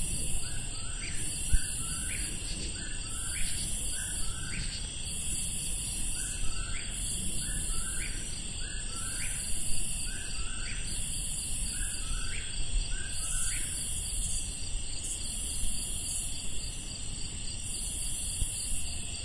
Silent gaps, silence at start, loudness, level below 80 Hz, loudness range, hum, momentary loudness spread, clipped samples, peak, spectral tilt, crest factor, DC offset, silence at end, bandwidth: none; 0 s; -33 LUFS; -38 dBFS; 1 LU; none; 5 LU; under 0.1%; -12 dBFS; -1.5 dB/octave; 20 dB; under 0.1%; 0 s; 11.5 kHz